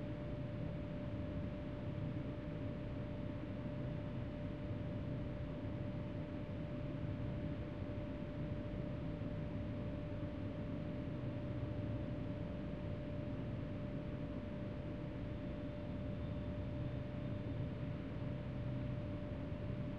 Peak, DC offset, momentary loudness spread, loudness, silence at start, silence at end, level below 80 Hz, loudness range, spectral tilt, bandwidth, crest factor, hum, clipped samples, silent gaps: -30 dBFS; 0.1%; 2 LU; -45 LUFS; 0 s; 0 s; -54 dBFS; 1 LU; -9.5 dB/octave; 6.6 kHz; 12 dB; none; under 0.1%; none